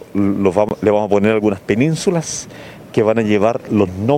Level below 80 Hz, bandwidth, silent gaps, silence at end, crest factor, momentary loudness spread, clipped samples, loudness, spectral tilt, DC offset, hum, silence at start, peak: -52 dBFS; 15 kHz; none; 0 s; 16 dB; 8 LU; under 0.1%; -16 LUFS; -6 dB/octave; under 0.1%; none; 0.15 s; 0 dBFS